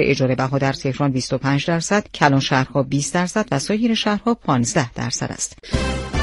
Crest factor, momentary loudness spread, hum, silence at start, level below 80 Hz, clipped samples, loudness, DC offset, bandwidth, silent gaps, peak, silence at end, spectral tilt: 20 dB; 6 LU; none; 0 s; -36 dBFS; under 0.1%; -20 LUFS; under 0.1%; 11.5 kHz; none; 0 dBFS; 0 s; -5 dB/octave